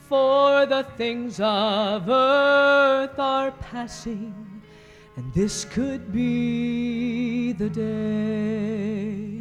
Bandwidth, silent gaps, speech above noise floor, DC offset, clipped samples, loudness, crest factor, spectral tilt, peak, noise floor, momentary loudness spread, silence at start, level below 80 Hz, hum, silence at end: 11.5 kHz; none; 25 dB; under 0.1%; under 0.1%; -22 LUFS; 16 dB; -5 dB/octave; -8 dBFS; -48 dBFS; 15 LU; 0.1 s; -50 dBFS; none; 0 s